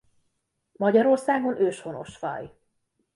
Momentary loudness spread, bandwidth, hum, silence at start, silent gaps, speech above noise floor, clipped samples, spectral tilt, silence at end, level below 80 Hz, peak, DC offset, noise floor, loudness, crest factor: 17 LU; 11.5 kHz; none; 0.8 s; none; 52 dB; under 0.1%; -6.5 dB/octave; 0.65 s; -68 dBFS; -8 dBFS; under 0.1%; -76 dBFS; -24 LUFS; 18 dB